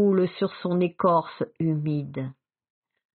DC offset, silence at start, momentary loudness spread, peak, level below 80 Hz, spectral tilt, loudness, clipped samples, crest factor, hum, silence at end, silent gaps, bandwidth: under 0.1%; 0 s; 12 LU; -10 dBFS; -68 dBFS; -7.5 dB/octave; -26 LUFS; under 0.1%; 16 dB; none; 0.85 s; none; 4.5 kHz